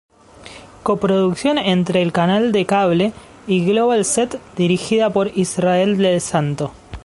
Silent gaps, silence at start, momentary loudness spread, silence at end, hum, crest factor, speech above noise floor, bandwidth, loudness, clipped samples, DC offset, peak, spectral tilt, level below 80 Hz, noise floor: none; 0.4 s; 8 LU; 0.05 s; none; 16 dB; 24 dB; 11.5 kHz; -17 LUFS; under 0.1%; under 0.1%; -2 dBFS; -5 dB/octave; -48 dBFS; -40 dBFS